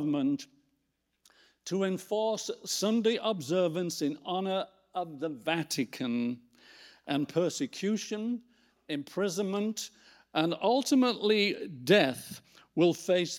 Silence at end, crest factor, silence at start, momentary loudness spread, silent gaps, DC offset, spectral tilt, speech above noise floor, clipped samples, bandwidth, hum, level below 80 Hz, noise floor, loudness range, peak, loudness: 0 s; 22 dB; 0 s; 13 LU; none; under 0.1%; -4.5 dB/octave; 49 dB; under 0.1%; 17.5 kHz; none; -80 dBFS; -79 dBFS; 6 LU; -10 dBFS; -31 LUFS